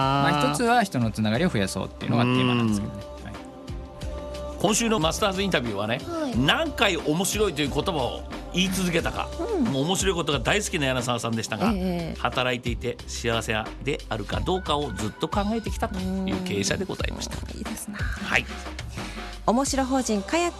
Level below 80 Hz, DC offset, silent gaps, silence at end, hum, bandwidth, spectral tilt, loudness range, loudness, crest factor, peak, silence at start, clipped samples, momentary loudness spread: -40 dBFS; under 0.1%; none; 0 s; none; 13 kHz; -4.5 dB/octave; 4 LU; -25 LUFS; 20 dB; -6 dBFS; 0 s; under 0.1%; 13 LU